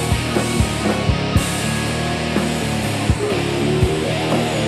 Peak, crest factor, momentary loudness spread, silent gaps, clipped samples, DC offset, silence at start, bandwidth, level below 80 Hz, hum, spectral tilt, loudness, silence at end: -2 dBFS; 16 dB; 2 LU; none; under 0.1%; under 0.1%; 0 s; 15 kHz; -30 dBFS; none; -5 dB/octave; -19 LUFS; 0 s